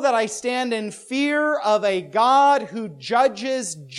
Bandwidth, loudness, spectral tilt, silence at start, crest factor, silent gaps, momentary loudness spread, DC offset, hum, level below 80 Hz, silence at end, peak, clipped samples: 12.5 kHz; -20 LUFS; -3.5 dB/octave; 0 s; 14 dB; none; 11 LU; under 0.1%; none; -70 dBFS; 0 s; -6 dBFS; under 0.1%